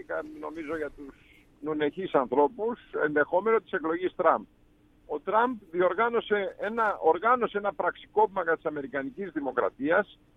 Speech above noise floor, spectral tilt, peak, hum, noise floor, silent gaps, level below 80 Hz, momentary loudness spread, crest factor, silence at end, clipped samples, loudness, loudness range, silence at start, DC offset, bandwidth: 33 dB; -7.5 dB/octave; -8 dBFS; none; -61 dBFS; none; -62 dBFS; 10 LU; 20 dB; 0.3 s; under 0.1%; -28 LUFS; 2 LU; 0.1 s; under 0.1%; 4 kHz